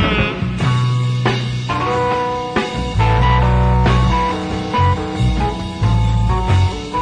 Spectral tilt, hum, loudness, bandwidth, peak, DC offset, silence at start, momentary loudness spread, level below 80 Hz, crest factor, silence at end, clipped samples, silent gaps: -6.5 dB/octave; none; -17 LUFS; 10 kHz; -2 dBFS; under 0.1%; 0 s; 6 LU; -22 dBFS; 14 dB; 0 s; under 0.1%; none